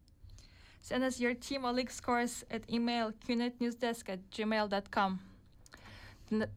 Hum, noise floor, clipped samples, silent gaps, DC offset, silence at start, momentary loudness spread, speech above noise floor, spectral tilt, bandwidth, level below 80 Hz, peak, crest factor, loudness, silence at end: none; -58 dBFS; under 0.1%; none; under 0.1%; 0.2 s; 17 LU; 23 dB; -4.5 dB/octave; 15.5 kHz; -62 dBFS; -20 dBFS; 16 dB; -36 LUFS; 0 s